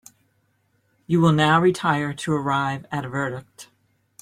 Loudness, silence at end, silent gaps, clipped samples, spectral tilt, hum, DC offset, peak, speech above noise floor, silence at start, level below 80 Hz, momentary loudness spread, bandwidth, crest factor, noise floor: -21 LUFS; 0.6 s; none; under 0.1%; -6 dB/octave; none; under 0.1%; -4 dBFS; 46 dB; 1.1 s; -58 dBFS; 12 LU; 13.5 kHz; 20 dB; -67 dBFS